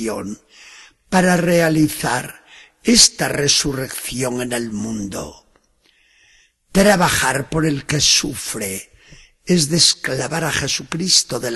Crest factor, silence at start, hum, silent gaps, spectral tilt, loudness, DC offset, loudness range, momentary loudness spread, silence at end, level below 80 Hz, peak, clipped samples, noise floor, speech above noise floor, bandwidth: 18 dB; 0 s; none; none; -3 dB/octave; -16 LUFS; under 0.1%; 6 LU; 13 LU; 0 s; -44 dBFS; 0 dBFS; under 0.1%; -58 dBFS; 41 dB; 16 kHz